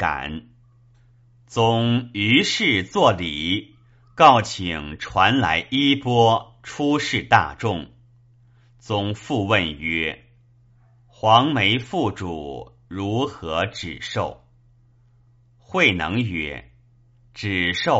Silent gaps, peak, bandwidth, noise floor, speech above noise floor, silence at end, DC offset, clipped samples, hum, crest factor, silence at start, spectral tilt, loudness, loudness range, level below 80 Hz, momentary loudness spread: none; 0 dBFS; 8 kHz; -56 dBFS; 35 dB; 0 s; under 0.1%; under 0.1%; none; 22 dB; 0 s; -3 dB/octave; -20 LUFS; 7 LU; -48 dBFS; 14 LU